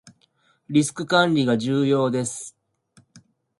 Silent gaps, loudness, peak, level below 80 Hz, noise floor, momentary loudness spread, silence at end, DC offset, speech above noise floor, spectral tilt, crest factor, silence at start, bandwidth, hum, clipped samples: none; -21 LUFS; -4 dBFS; -64 dBFS; -64 dBFS; 11 LU; 0.4 s; under 0.1%; 43 dB; -5 dB/octave; 20 dB; 0.05 s; 11.5 kHz; none; under 0.1%